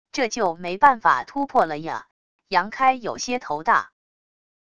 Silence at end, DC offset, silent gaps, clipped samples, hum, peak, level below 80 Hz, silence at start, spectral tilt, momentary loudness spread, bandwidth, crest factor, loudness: 0.75 s; 0.5%; 2.11-2.39 s; under 0.1%; none; -2 dBFS; -60 dBFS; 0.15 s; -3.5 dB/octave; 11 LU; 10 kHz; 20 dB; -22 LUFS